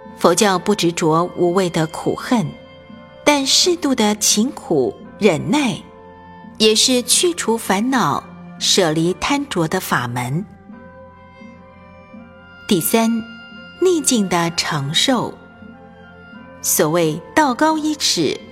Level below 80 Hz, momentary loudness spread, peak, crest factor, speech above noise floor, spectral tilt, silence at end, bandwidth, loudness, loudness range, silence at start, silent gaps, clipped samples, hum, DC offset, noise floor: -52 dBFS; 10 LU; 0 dBFS; 18 dB; 25 dB; -3.5 dB/octave; 0 s; 16.5 kHz; -17 LUFS; 7 LU; 0 s; none; under 0.1%; none; under 0.1%; -42 dBFS